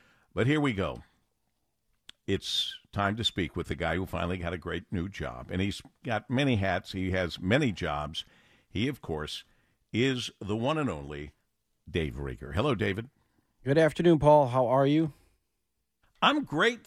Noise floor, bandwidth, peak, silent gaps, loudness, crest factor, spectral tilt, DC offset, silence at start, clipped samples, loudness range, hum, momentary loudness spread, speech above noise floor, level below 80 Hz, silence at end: -82 dBFS; 15 kHz; -8 dBFS; none; -29 LUFS; 22 dB; -6 dB/octave; under 0.1%; 0.35 s; under 0.1%; 7 LU; none; 14 LU; 53 dB; -50 dBFS; 0.05 s